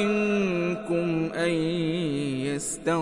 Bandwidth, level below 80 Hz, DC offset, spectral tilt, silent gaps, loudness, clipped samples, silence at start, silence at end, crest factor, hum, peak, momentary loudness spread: 11.5 kHz; -58 dBFS; under 0.1%; -5.5 dB/octave; none; -26 LUFS; under 0.1%; 0 s; 0 s; 14 dB; none; -12 dBFS; 4 LU